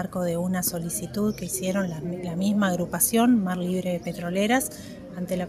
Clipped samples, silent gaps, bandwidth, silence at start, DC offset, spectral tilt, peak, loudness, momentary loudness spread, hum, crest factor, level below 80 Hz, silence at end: under 0.1%; none; 15.5 kHz; 0 s; under 0.1%; -5 dB/octave; -8 dBFS; -25 LUFS; 10 LU; none; 18 dB; -54 dBFS; 0 s